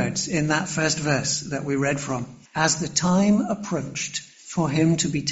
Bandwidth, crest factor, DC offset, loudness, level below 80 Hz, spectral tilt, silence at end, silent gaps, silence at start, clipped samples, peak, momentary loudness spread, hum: 8.2 kHz; 18 dB; under 0.1%; -23 LUFS; -54 dBFS; -4 dB/octave; 0 s; none; 0 s; under 0.1%; -6 dBFS; 9 LU; none